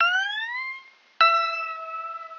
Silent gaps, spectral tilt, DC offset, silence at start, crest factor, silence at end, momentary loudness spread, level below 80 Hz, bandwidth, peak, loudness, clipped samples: none; 2 dB/octave; under 0.1%; 0 s; 22 dB; 0 s; 15 LU; under -90 dBFS; 7 kHz; -4 dBFS; -24 LUFS; under 0.1%